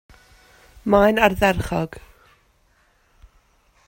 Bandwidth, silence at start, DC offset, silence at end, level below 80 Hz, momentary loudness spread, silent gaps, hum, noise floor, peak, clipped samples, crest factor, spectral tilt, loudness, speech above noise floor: 16.5 kHz; 0.85 s; under 0.1%; 1.9 s; -42 dBFS; 14 LU; none; none; -61 dBFS; -2 dBFS; under 0.1%; 22 dB; -6 dB/octave; -19 LUFS; 43 dB